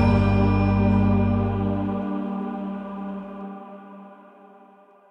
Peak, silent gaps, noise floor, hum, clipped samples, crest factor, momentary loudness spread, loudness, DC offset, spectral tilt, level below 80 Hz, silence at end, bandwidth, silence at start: -6 dBFS; none; -52 dBFS; none; under 0.1%; 16 dB; 20 LU; -23 LUFS; under 0.1%; -10 dB/octave; -36 dBFS; 0.95 s; 5.6 kHz; 0 s